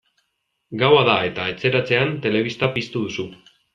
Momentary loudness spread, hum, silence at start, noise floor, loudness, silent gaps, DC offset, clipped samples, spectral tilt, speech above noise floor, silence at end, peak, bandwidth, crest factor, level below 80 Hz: 13 LU; none; 0.7 s; -73 dBFS; -20 LUFS; none; under 0.1%; under 0.1%; -6 dB/octave; 53 dB; 0.4 s; -2 dBFS; 7.4 kHz; 20 dB; -58 dBFS